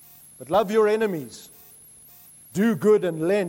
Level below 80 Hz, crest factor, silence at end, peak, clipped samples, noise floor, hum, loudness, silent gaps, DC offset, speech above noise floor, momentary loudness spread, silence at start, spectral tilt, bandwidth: -62 dBFS; 14 dB; 0 s; -10 dBFS; under 0.1%; -49 dBFS; none; -22 LUFS; none; under 0.1%; 28 dB; 19 LU; 0.4 s; -6 dB/octave; 16.5 kHz